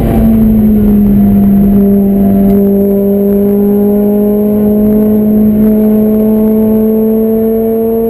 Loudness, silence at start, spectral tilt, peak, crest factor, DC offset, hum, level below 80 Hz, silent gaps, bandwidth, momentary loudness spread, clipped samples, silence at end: -8 LUFS; 0 s; -10 dB/octave; 0 dBFS; 6 dB; under 0.1%; none; -24 dBFS; none; 13.5 kHz; 2 LU; 0.1%; 0 s